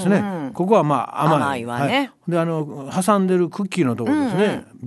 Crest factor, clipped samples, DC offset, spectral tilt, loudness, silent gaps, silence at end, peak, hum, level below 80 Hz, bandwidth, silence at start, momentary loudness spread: 18 dB; under 0.1%; under 0.1%; -6.5 dB/octave; -20 LUFS; none; 0 s; -2 dBFS; none; -62 dBFS; 12.5 kHz; 0 s; 6 LU